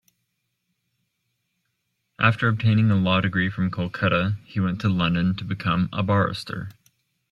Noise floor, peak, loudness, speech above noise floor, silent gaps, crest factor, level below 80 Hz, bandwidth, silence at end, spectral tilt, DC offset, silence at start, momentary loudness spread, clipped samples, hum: -76 dBFS; -4 dBFS; -23 LUFS; 54 dB; none; 20 dB; -54 dBFS; 11 kHz; 0.6 s; -7.5 dB/octave; under 0.1%; 2.2 s; 7 LU; under 0.1%; none